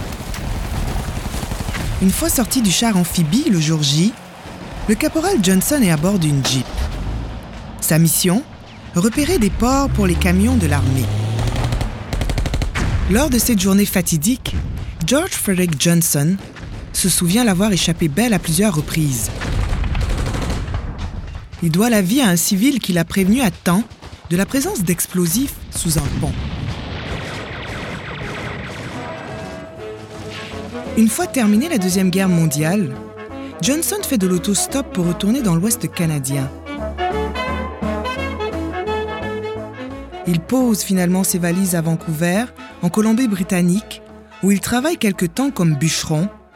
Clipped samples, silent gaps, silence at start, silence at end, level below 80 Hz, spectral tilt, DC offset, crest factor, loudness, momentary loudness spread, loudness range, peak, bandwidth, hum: under 0.1%; none; 0 s; 0.2 s; -30 dBFS; -4.5 dB/octave; under 0.1%; 14 dB; -18 LUFS; 13 LU; 6 LU; -4 dBFS; 18 kHz; none